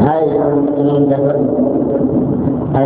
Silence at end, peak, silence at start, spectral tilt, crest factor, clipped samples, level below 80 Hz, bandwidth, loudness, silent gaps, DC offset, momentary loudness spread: 0 s; 0 dBFS; 0 s; -13 dB/octave; 14 dB; under 0.1%; -38 dBFS; 4 kHz; -14 LUFS; none; under 0.1%; 3 LU